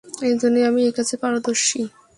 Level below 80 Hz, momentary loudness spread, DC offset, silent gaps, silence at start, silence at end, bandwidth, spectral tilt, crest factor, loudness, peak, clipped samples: -64 dBFS; 5 LU; under 0.1%; none; 0.05 s; 0.3 s; 11.5 kHz; -2.5 dB/octave; 14 dB; -20 LUFS; -6 dBFS; under 0.1%